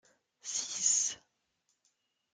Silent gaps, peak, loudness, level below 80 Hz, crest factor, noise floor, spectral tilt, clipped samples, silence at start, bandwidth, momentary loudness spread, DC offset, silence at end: none; -16 dBFS; -31 LUFS; -86 dBFS; 22 dB; -80 dBFS; 3 dB/octave; under 0.1%; 0.45 s; 10.5 kHz; 19 LU; under 0.1%; 1.2 s